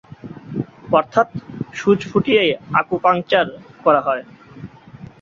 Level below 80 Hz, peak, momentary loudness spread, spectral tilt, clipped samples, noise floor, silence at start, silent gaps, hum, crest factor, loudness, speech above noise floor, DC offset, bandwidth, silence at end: -54 dBFS; -2 dBFS; 21 LU; -6 dB/octave; under 0.1%; -40 dBFS; 0.25 s; none; none; 18 dB; -18 LUFS; 23 dB; under 0.1%; 7.6 kHz; 0.15 s